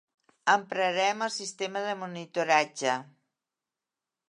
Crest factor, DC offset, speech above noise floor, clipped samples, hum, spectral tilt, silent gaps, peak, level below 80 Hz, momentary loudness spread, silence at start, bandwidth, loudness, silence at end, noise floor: 22 dB; under 0.1%; 61 dB; under 0.1%; none; -2.5 dB/octave; none; -8 dBFS; -86 dBFS; 9 LU; 0.45 s; 11 kHz; -28 LUFS; 1.25 s; -90 dBFS